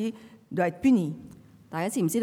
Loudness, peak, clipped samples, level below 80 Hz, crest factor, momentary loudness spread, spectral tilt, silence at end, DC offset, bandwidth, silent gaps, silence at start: -27 LUFS; -12 dBFS; under 0.1%; -66 dBFS; 14 dB; 16 LU; -6 dB/octave; 0 s; under 0.1%; 17 kHz; none; 0 s